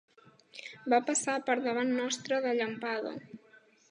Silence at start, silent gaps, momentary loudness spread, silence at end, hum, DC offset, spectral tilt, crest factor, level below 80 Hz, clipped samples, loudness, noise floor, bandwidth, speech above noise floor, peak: 0.55 s; none; 18 LU; 0.55 s; none; under 0.1%; -2.5 dB/octave; 20 dB; -86 dBFS; under 0.1%; -31 LUFS; -62 dBFS; 11 kHz; 31 dB; -12 dBFS